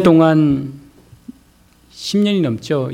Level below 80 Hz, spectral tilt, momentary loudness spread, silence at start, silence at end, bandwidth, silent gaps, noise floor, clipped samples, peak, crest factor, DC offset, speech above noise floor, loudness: -50 dBFS; -7 dB/octave; 14 LU; 0 s; 0 s; 13 kHz; none; -51 dBFS; under 0.1%; 0 dBFS; 16 dB; under 0.1%; 37 dB; -16 LUFS